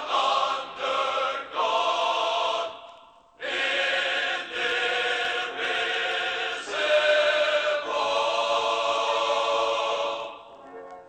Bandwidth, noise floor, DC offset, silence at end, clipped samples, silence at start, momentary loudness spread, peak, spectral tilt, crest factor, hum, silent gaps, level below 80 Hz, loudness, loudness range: 9 kHz; -52 dBFS; under 0.1%; 0 s; under 0.1%; 0 s; 8 LU; -10 dBFS; -0.5 dB/octave; 16 dB; none; none; -68 dBFS; -25 LUFS; 3 LU